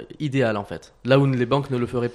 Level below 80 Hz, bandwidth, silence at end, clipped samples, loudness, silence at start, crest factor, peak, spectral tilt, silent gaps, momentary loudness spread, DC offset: -54 dBFS; 11 kHz; 0 s; under 0.1%; -22 LUFS; 0 s; 18 dB; -4 dBFS; -7.5 dB/octave; none; 12 LU; under 0.1%